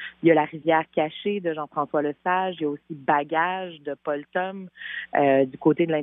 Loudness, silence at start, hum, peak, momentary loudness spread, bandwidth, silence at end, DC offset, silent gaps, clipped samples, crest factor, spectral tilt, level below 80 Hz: -25 LUFS; 0 s; none; -6 dBFS; 12 LU; 3.9 kHz; 0 s; under 0.1%; none; under 0.1%; 18 dB; -4.5 dB/octave; -72 dBFS